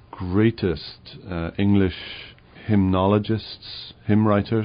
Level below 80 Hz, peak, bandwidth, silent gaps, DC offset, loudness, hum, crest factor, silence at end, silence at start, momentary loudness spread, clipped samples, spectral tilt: -46 dBFS; -6 dBFS; 5.2 kHz; none; under 0.1%; -22 LUFS; none; 16 dB; 0 s; 0.15 s; 18 LU; under 0.1%; -6.5 dB/octave